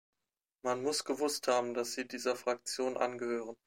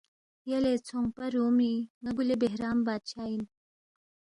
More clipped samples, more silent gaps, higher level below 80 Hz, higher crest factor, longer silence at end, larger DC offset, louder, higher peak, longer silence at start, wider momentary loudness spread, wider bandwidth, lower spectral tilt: neither; second, none vs 1.90-2.01 s; second, -84 dBFS vs -62 dBFS; about the same, 18 dB vs 16 dB; second, 0.1 s vs 0.9 s; neither; second, -35 LUFS vs -30 LUFS; about the same, -18 dBFS vs -16 dBFS; first, 0.65 s vs 0.45 s; second, 6 LU vs 9 LU; first, 16.5 kHz vs 10.5 kHz; second, -2.5 dB/octave vs -6 dB/octave